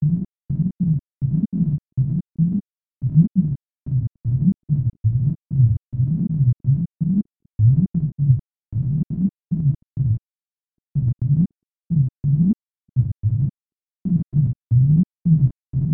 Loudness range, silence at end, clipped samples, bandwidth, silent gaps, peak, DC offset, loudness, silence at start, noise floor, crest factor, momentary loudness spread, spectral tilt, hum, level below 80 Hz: 3 LU; 0 s; under 0.1%; 1 kHz; 2.96-3.00 s; -4 dBFS; under 0.1%; -21 LUFS; 0 s; under -90 dBFS; 16 dB; 8 LU; -16 dB/octave; none; -42 dBFS